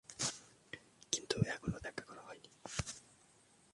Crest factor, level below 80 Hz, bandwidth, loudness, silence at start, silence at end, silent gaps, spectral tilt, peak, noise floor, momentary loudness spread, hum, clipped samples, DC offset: 28 dB; -62 dBFS; 11.5 kHz; -41 LUFS; 0.1 s; 0.6 s; none; -3.5 dB/octave; -16 dBFS; -68 dBFS; 16 LU; none; under 0.1%; under 0.1%